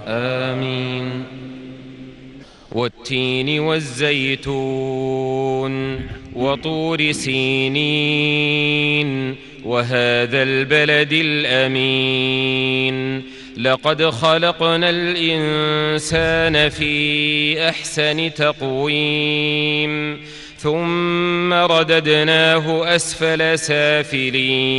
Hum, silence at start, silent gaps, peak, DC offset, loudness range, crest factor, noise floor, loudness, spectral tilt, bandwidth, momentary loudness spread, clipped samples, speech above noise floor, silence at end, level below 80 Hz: none; 0 s; none; -2 dBFS; under 0.1%; 5 LU; 16 dB; -40 dBFS; -17 LUFS; -4.5 dB/octave; 11.5 kHz; 10 LU; under 0.1%; 22 dB; 0 s; -46 dBFS